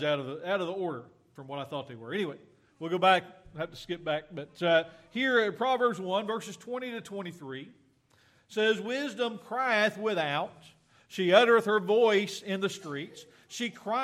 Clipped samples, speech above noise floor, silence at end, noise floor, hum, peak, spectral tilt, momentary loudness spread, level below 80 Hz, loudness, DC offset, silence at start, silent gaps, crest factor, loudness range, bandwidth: under 0.1%; 36 dB; 0 s; -65 dBFS; none; -8 dBFS; -4.5 dB/octave; 16 LU; -72 dBFS; -29 LUFS; under 0.1%; 0 s; none; 22 dB; 7 LU; 14.5 kHz